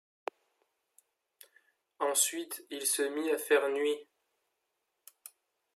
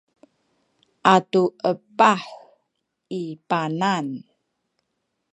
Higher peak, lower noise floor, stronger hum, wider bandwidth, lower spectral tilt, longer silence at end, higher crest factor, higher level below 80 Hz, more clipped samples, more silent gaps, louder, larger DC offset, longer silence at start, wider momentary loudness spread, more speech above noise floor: second, -14 dBFS vs 0 dBFS; first, -83 dBFS vs -77 dBFS; neither; first, 15.5 kHz vs 9.4 kHz; second, 0.5 dB/octave vs -5.5 dB/octave; first, 1.75 s vs 1.15 s; about the same, 22 dB vs 24 dB; second, under -90 dBFS vs -72 dBFS; neither; neither; second, -31 LUFS vs -21 LUFS; neither; first, 2 s vs 1.05 s; first, 24 LU vs 15 LU; second, 51 dB vs 56 dB